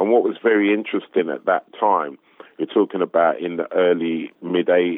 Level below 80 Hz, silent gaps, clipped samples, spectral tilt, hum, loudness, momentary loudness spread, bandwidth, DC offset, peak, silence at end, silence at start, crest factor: under -90 dBFS; none; under 0.1%; -9.5 dB/octave; none; -20 LUFS; 7 LU; 3.9 kHz; under 0.1%; -4 dBFS; 0 s; 0 s; 16 dB